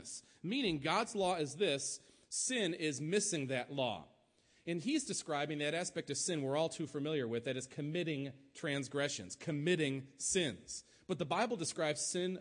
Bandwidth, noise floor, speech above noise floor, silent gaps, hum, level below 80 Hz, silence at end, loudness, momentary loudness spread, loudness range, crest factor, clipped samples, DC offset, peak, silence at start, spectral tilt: 10.5 kHz; -71 dBFS; 34 dB; none; none; -74 dBFS; 0 s; -37 LUFS; 8 LU; 2 LU; 18 dB; under 0.1%; under 0.1%; -20 dBFS; 0 s; -3.5 dB/octave